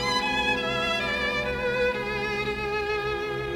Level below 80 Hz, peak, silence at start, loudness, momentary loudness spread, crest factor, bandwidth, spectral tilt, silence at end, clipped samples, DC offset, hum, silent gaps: -44 dBFS; -14 dBFS; 0 s; -26 LUFS; 4 LU; 14 dB; 18.5 kHz; -4 dB/octave; 0 s; under 0.1%; under 0.1%; none; none